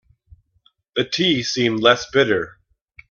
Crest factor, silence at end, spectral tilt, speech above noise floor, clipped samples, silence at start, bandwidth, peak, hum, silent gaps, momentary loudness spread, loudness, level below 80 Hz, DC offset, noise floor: 20 dB; 0.6 s; -4 dB/octave; 44 dB; under 0.1%; 0.95 s; 7.2 kHz; 0 dBFS; none; none; 10 LU; -18 LUFS; -56 dBFS; under 0.1%; -62 dBFS